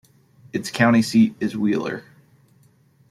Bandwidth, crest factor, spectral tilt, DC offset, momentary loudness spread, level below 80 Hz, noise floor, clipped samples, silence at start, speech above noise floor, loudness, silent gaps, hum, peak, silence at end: 13.5 kHz; 18 dB; -5.5 dB/octave; under 0.1%; 14 LU; -62 dBFS; -57 dBFS; under 0.1%; 0.55 s; 37 dB; -20 LUFS; none; none; -4 dBFS; 1.1 s